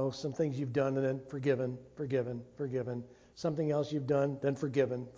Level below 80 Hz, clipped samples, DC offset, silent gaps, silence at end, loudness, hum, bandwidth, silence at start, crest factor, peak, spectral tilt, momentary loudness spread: -68 dBFS; under 0.1%; under 0.1%; none; 0 s; -34 LUFS; none; 7.8 kHz; 0 s; 18 dB; -16 dBFS; -7.5 dB/octave; 9 LU